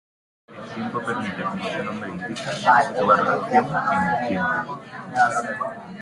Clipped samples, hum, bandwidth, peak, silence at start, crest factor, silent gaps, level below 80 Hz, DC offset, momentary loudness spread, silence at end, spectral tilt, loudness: under 0.1%; none; 11.5 kHz; -4 dBFS; 0.5 s; 20 dB; none; -60 dBFS; under 0.1%; 13 LU; 0 s; -5 dB/octave; -22 LUFS